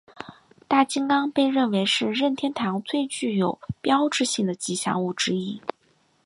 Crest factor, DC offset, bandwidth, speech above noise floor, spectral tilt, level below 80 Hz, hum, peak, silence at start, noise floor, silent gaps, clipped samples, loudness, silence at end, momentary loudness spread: 20 dB; under 0.1%; 11.5 kHz; 41 dB; -4 dB/octave; -62 dBFS; none; -6 dBFS; 0.2 s; -64 dBFS; none; under 0.1%; -24 LUFS; 0.55 s; 9 LU